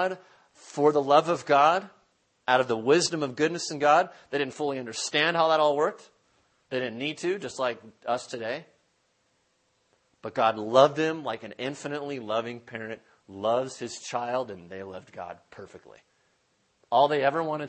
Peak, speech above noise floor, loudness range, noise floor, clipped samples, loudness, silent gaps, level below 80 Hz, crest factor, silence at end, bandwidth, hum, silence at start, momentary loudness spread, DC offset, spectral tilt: -4 dBFS; 44 dB; 9 LU; -71 dBFS; under 0.1%; -26 LUFS; none; -76 dBFS; 24 dB; 0 s; 8.8 kHz; none; 0 s; 18 LU; under 0.1%; -4 dB/octave